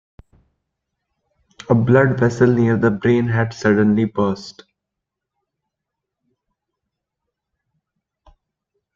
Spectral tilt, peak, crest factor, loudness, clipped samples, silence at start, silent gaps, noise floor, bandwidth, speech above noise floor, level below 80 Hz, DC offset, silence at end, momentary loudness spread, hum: -8 dB/octave; -2 dBFS; 18 dB; -17 LUFS; under 0.1%; 1.7 s; none; -82 dBFS; 7.6 kHz; 66 dB; -54 dBFS; under 0.1%; 4.45 s; 7 LU; none